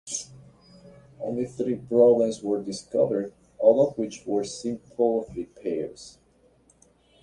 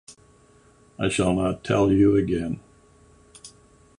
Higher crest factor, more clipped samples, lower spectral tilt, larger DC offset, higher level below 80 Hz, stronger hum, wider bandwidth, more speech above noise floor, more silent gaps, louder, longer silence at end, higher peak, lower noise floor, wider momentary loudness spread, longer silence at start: about the same, 20 dB vs 18 dB; neither; about the same, -5.5 dB/octave vs -6.5 dB/octave; neither; second, -62 dBFS vs -46 dBFS; neither; about the same, 11 kHz vs 11 kHz; about the same, 36 dB vs 34 dB; neither; second, -25 LUFS vs -22 LUFS; first, 1.1 s vs 0.5 s; about the same, -6 dBFS vs -8 dBFS; first, -61 dBFS vs -56 dBFS; first, 17 LU vs 11 LU; about the same, 0.05 s vs 0.1 s